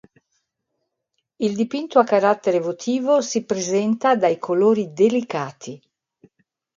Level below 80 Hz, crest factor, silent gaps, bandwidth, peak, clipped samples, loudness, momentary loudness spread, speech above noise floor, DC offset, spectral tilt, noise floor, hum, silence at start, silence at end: -70 dBFS; 20 dB; none; 7.6 kHz; -2 dBFS; under 0.1%; -20 LUFS; 9 LU; 57 dB; under 0.1%; -5 dB/octave; -77 dBFS; none; 1.4 s; 1 s